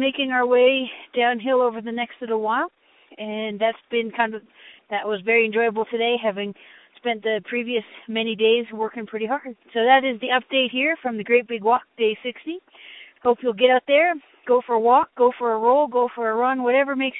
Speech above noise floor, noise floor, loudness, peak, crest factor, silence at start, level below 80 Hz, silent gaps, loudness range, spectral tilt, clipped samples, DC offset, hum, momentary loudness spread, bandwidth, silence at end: 24 dB; -45 dBFS; -21 LUFS; -4 dBFS; 18 dB; 0 s; -72 dBFS; none; 5 LU; -8.5 dB/octave; under 0.1%; under 0.1%; none; 12 LU; 4 kHz; 0 s